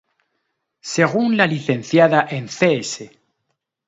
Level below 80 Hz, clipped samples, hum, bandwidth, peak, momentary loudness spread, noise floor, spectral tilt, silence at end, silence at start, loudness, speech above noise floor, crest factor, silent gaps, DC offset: -66 dBFS; under 0.1%; none; 8 kHz; 0 dBFS; 13 LU; -75 dBFS; -5 dB/octave; 0.8 s; 0.85 s; -18 LUFS; 57 dB; 20 dB; none; under 0.1%